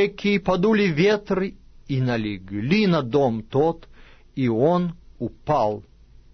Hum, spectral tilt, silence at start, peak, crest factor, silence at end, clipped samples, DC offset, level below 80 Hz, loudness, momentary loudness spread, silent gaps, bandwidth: none; -7.5 dB/octave; 0 s; -8 dBFS; 14 dB; 0.55 s; under 0.1%; under 0.1%; -48 dBFS; -22 LUFS; 12 LU; none; 6.4 kHz